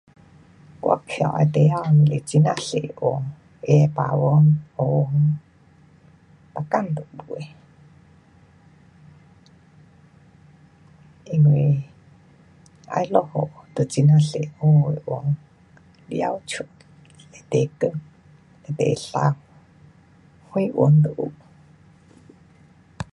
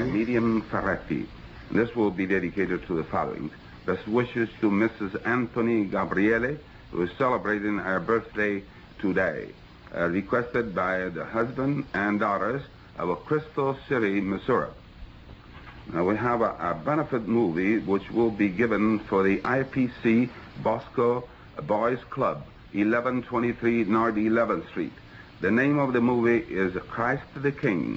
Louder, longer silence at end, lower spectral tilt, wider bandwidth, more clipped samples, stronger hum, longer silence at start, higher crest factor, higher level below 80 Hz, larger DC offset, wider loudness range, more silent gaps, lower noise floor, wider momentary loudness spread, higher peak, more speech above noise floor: first, -21 LUFS vs -26 LUFS; about the same, 0.1 s vs 0 s; about the same, -8 dB/octave vs -8.5 dB/octave; first, 10.5 kHz vs 7.6 kHz; neither; neither; first, 0.85 s vs 0 s; first, 20 dB vs 14 dB; second, -58 dBFS vs -52 dBFS; neither; first, 12 LU vs 3 LU; neither; first, -53 dBFS vs -46 dBFS; first, 17 LU vs 9 LU; first, -4 dBFS vs -12 dBFS; first, 34 dB vs 21 dB